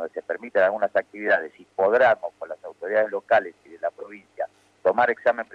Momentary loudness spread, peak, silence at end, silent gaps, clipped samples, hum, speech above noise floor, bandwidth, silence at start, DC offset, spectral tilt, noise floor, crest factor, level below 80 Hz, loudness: 15 LU; -8 dBFS; 0.1 s; none; under 0.1%; none; 19 dB; 7 kHz; 0 s; under 0.1%; -5.5 dB/octave; -42 dBFS; 16 dB; -72 dBFS; -23 LUFS